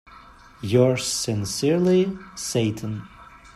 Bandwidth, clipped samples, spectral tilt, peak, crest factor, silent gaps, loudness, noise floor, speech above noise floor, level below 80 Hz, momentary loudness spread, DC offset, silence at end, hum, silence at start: 15 kHz; under 0.1%; -5 dB/octave; -6 dBFS; 18 dB; none; -23 LUFS; -47 dBFS; 25 dB; -54 dBFS; 13 LU; under 0.1%; 0.1 s; none; 0.1 s